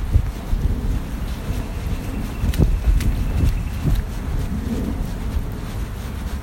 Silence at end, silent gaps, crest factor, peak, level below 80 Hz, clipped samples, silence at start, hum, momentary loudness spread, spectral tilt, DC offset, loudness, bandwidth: 0 s; none; 20 dB; -2 dBFS; -22 dBFS; under 0.1%; 0 s; none; 8 LU; -7 dB/octave; under 0.1%; -24 LUFS; 17 kHz